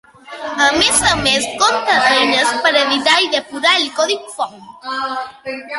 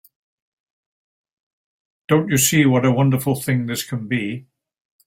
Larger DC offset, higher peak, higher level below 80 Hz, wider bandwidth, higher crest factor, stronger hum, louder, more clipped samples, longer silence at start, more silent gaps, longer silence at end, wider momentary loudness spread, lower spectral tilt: neither; about the same, 0 dBFS vs -2 dBFS; first, -46 dBFS vs -56 dBFS; second, 12 kHz vs 16.5 kHz; about the same, 16 dB vs 18 dB; neither; first, -14 LUFS vs -18 LUFS; neither; second, 0.25 s vs 2.1 s; neither; second, 0 s vs 0.65 s; first, 14 LU vs 10 LU; second, -1 dB/octave vs -5 dB/octave